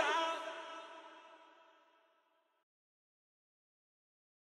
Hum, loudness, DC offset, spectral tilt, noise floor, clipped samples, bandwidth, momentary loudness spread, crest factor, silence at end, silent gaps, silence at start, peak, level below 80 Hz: none; -40 LUFS; under 0.1%; 0 dB/octave; -77 dBFS; under 0.1%; 13 kHz; 25 LU; 24 dB; 2.9 s; none; 0 s; -22 dBFS; under -90 dBFS